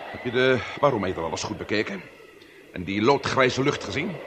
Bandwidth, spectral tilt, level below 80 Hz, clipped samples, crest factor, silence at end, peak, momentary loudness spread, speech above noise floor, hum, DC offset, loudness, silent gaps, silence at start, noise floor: 9.2 kHz; -5 dB/octave; -56 dBFS; under 0.1%; 20 dB; 0 s; -6 dBFS; 10 LU; 24 dB; none; under 0.1%; -24 LUFS; none; 0 s; -49 dBFS